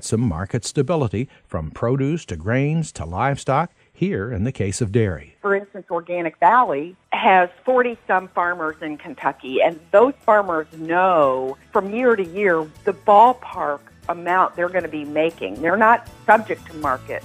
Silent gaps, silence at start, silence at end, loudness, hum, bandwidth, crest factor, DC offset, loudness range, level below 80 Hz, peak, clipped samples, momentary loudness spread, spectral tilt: none; 0 s; 0.05 s; -20 LUFS; none; 15 kHz; 20 dB; under 0.1%; 5 LU; -48 dBFS; 0 dBFS; under 0.1%; 11 LU; -6 dB/octave